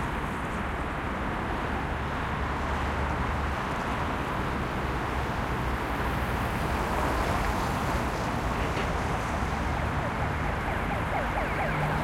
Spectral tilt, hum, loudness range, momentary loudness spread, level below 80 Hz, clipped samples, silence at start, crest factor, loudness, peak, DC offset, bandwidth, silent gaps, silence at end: -6 dB/octave; none; 2 LU; 3 LU; -36 dBFS; under 0.1%; 0 s; 14 dB; -30 LUFS; -14 dBFS; under 0.1%; 16.5 kHz; none; 0 s